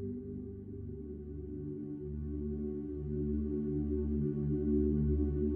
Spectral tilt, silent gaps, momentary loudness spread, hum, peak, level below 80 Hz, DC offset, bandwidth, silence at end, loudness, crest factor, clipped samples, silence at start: -14 dB/octave; none; 13 LU; none; -22 dBFS; -42 dBFS; under 0.1%; 2.1 kHz; 0 s; -37 LUFS; 14 dB; under 0.1%; 0 s